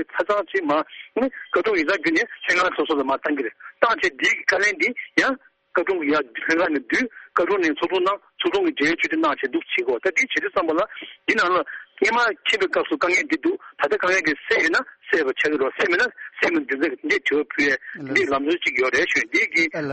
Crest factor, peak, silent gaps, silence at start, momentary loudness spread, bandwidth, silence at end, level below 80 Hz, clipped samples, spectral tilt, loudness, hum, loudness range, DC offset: 20 dB; -2 dBFS; none; 0 s; 5 LU; 8.4 kHz; 0 s; -60 dBFS; under 0.1%; -3 dB/octave; -21 LUFS; none; 1 LU; under 0.1%